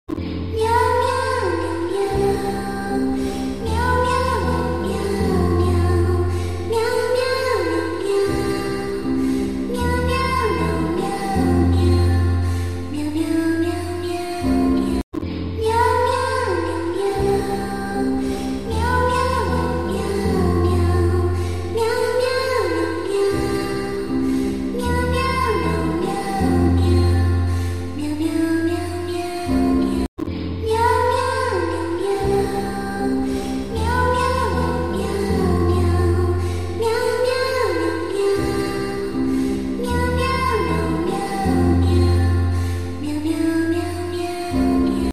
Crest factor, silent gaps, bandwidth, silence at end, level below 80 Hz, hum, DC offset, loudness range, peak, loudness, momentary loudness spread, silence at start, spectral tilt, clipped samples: 14 dB; 15.03-15.12 s, 30.08-30.17 s; 13.5 kHz; 0 s; -32 dBFS; none; 2%; 2 LU; -4 dBFS; -20 LUFS; 7 LU; 0.05 s; -6.5 dB/octave; under 0.1%